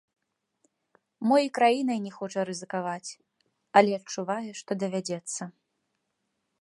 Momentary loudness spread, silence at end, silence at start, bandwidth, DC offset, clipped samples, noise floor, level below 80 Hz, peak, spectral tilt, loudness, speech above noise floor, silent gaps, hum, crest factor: 13 LU; 1.1 s; 1.2 s; 11.5 kHz; under 0.1%; under 0.1%; -79 dBFS; -80 dBFS; -4 dBFS; -4.5 dB/octave; -28 LUFS; 52 dB; none; none; 26 dB